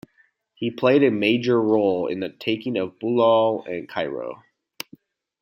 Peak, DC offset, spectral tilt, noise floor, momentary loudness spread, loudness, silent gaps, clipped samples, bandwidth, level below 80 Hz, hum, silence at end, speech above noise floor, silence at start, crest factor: -4 dBFS; under 0.1%; -6.5 dB/octave; -63 dBFS; 17 LU; -22 LUFS; none; under 0.1%; 16 kHz; -70 dBFS; none; 1.05 s; 42 dB; 0.6 s; 18 dB